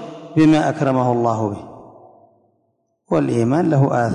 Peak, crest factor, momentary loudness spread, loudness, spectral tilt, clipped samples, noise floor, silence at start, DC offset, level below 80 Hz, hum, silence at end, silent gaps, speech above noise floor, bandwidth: -4 dBFS; 14 dB; 10 LU; -17 LUFS; -8 dB/octave; under 0.1%; -67 dBFS; 0 s; under 0.1%; -54 dBFS; none; 0 s; none; 51 dB; 10.5 kHz